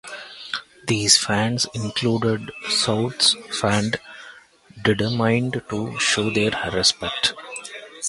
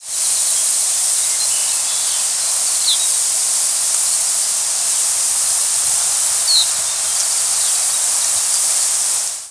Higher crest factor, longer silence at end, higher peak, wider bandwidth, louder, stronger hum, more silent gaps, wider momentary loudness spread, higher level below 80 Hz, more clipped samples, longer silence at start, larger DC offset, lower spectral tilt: first, 22 dB vs 16 dB; about the same, 0 s vs 0 s; about the same, -2 dBFS vs 0 dBFS; about the same, 11.5 kHz vs 11 kHz; second, -21 LUFS vs -13 LUFS; neither; neither; first, 16 LU vs 2 LU; first, -52 dBFS vs -62 dBFS; neither; about the same, 0.05 s vs 0 s; neither; first, -3 dB/octave vs 3.5 dB/octave